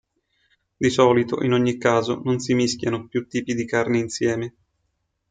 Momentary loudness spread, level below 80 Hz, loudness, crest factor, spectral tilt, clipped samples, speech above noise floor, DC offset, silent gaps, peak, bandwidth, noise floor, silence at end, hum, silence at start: 8 LU; -60 dBFS; -22 LUFS; 18 dB; -5.5 dB/octave; under 0.1%; 52 dB; under 0.1%; none; -4 dBFS; 9.4 kHz; -73 dBFS; 0.8 s; none; 0.8 s